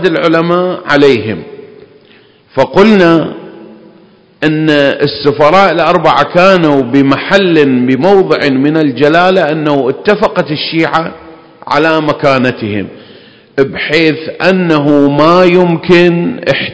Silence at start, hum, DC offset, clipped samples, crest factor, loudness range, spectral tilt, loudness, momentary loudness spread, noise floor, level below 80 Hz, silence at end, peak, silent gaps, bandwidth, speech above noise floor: 0 s; none; 0.5%; 3%; 10 dB; 5 LU; -7 dB/octave; -9 LUFS; 8 LU; -42 dBFS; -44 dBFS; 0 s; 0 dBFS; none; 8 kHz; 34 dB